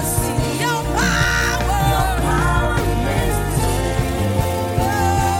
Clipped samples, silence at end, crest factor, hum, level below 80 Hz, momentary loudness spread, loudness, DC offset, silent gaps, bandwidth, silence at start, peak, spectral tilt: under 0.1%; 0 s; 12 dB; none; -24 dBFS; 3 LU; -19 LUFS; under 0.1%; none; 17 kHz; 0 s; -6 dBFS; -4.5 dB/octave